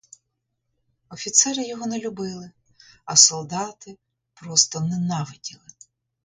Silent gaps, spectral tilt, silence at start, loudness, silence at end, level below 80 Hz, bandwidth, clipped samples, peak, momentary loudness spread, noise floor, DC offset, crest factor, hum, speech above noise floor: none; -2 dB/octave; 1.1 s; -19 LUFS; 0.7 s; -66 dBFS; 11 kHz; under 0.1%; 0 dBFS; 20 LU; -77 dBFS; under 0.1%; 26 dB; none; 54 dB